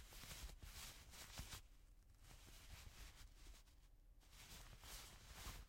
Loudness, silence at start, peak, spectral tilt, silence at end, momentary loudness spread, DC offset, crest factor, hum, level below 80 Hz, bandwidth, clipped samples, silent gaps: -59 LUFS; 0 s; -40 dBFS; -2 dB/octave; 0 s; 10 LU; under 0.1%; 20 dB; none; -62 dBFS; 16.5 kHz; under 0.1%; none